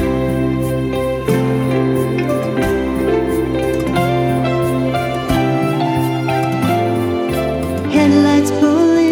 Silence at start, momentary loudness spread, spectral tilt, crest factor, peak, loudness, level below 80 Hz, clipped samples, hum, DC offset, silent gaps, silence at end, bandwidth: 0 s; 6 LU; -7 dB/octave; 14 dB; -2 dBFS; -16 LUFS; -34 dBFS; under 0.1%; none; under 0.1%; none; 0 s; 17.5 kHz